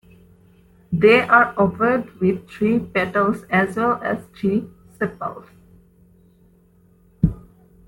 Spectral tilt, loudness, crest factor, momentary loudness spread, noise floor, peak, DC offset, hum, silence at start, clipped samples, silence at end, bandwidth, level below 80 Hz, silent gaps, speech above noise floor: -7.5 dB/octave; -20 LUFS; 20 dB; 13 LU; -55 dBFS; -2 dBFS; under 0.1%; none; 0.9 s; under 0.1%; 0.45 s; 16.5 kHz; -44 dBFS; none; 36 dB